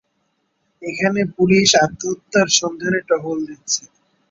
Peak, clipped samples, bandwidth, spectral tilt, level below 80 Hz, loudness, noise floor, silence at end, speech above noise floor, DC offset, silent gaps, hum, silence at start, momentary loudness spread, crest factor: 0 dBFS; under 0.1%; 7.8 kHz; -3 dB/octave; -56 dBFS; -17 LUFS; -68 dBFS; 0.5 s; 50 dB; under 0.1%; none; none; 0.8 s; 13 LU; 20 dB